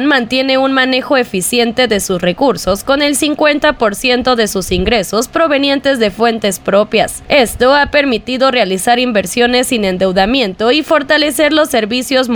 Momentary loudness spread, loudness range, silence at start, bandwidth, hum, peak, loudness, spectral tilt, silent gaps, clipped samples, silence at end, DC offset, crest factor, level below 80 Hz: 3 LU; 1 LU; 0 s; over 20 kHz; none; 0 dBFS; -12 LUFS; -3.5 dB/octave; none; under 0.1%; 0 s; under 0.1%; 12 dB; -36 dBFS